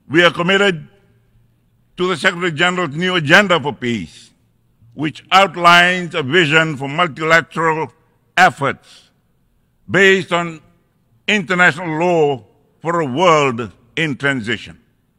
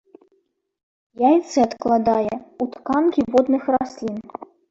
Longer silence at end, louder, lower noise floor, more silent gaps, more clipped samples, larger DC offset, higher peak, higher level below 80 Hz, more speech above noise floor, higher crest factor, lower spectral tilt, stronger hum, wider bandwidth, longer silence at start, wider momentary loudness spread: first, 0.45 s vs 0.25 s; first, -15 LUFS vs -20 LUFS; second, -60 dBFS vs -67 dBFS; neither; first, 0.2% vs under 0.1%; neither; first, 0 dBFS vs -4 dBFS; about the same, -56 dBFS vs -56 dBFS; about the same, 45 dB vs 47 dB; about the same, 16 dB vs 18 dB; second, -4.5 dB/octave vs -6 dB/octave; neither; first, 17 kHz vs 8 kHz; second, 0.1 s vs 1.2 s; about the same, 14 LU vs 12 LU